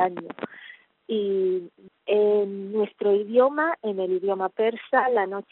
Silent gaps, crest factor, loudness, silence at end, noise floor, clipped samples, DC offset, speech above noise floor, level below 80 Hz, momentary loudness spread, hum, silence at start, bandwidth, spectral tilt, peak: none; 18 dB; -24 LUFS; 0.1 s; -48 dBFS; under 0.1%; under 0.1%; 25 dB; -76 dBFS; 15 LU; none; 0 s; 4.1 kHz; -4 dB/octave; -8 dBFS